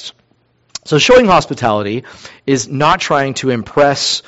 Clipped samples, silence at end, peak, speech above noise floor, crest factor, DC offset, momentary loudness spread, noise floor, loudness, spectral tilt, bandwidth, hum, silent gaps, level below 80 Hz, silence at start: under 0.1%; 0.05 s; 0 dBFS; 44 dB; 14 dB; under 0.1%; 17 LU; -57 dBFS; -13 LUFS; -4 dB/octave; 8.2 kHz; none; none; -42 dBFS; 0 s